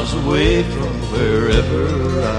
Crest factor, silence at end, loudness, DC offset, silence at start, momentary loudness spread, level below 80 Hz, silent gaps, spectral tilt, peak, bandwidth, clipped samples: 14 dB; 0 s; -17 LUFS; under 0.1%; 0 s; 6 LU; -24 dBFS; none; -6.5 dB/octave; -2 dBFS; 11 kHz; under 0.1%